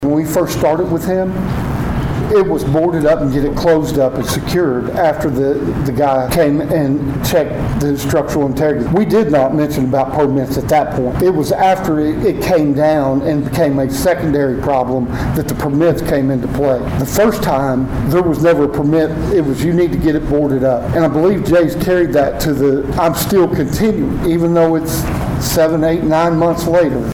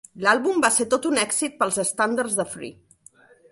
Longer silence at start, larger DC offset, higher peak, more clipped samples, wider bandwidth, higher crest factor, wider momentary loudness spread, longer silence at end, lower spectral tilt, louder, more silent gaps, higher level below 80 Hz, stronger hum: second, 0 s vs 0.15 s; neither; about the same, -2 dBFS vs -4 dBFS; neither; first, 19.5 kHz vs 12 kHz; second, 10 dB vs 20 dB; second, 4 LU vs 9 LU; second, 0 s vs 0.8 s; first, -6.5 dB/octave vs -2 dB/octave; first, -14 LUFS vs -22 LUFS; neither; first, -30 dBFS vs -66 dBFS; neither